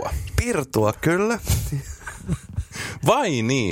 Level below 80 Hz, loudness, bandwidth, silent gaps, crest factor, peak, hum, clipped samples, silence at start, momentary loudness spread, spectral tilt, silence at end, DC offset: -34 dBFS; -23 LUFS; 16.5 kHz; none; 20 dB; -2 dBFS; none; under 0.1%; 0 s; 11 LU; -5 dB/octave; 0 s; under 0.1%